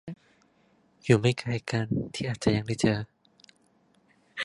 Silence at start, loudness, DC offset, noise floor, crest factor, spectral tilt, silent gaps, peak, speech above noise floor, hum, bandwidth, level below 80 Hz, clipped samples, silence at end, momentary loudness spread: 0.05 s; -28 LUFS; under 0.1%; -65 dBFS; 24 dB; -6 dB/octave; none; -6 dBFS; 39 dB; none; 11.5 kHz; -56 dBFS; under 0.1%; 0 s; 20 LU